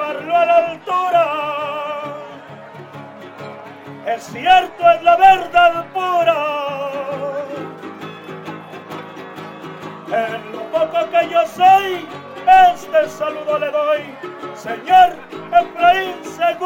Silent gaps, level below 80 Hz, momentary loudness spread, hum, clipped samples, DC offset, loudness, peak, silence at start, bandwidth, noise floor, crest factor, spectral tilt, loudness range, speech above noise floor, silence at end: none; -54 dBFS; 21 LU; none; under 0.1%; under 0.1%; -16 LUFS; 0 dBFS; 0 s; 16.5 kHz; -36 dBFS; 16 dB; -4 dB/octave; 12 LU; 21 dB; 0 s